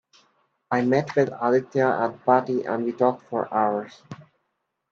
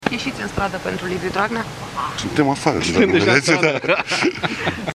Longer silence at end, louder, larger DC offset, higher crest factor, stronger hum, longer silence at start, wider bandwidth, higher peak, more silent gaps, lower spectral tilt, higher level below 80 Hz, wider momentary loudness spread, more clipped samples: first, 0.7 s vs 0 s; second, -23 LUFS vs -19 LUFS; neither; about the same, 20 dB vs 20 dB; neither; first, 0.7 s vs 0 s; second, 7.2 kHz vs 15 kHz; second, -4 dBFS vs 0 dBFS; neither; first, -7.5 dB/octave vs -4.5 dB/octave; second, -70 dBFS vs -46 dBFS; about the same, 12 LU vs 10 LU; neither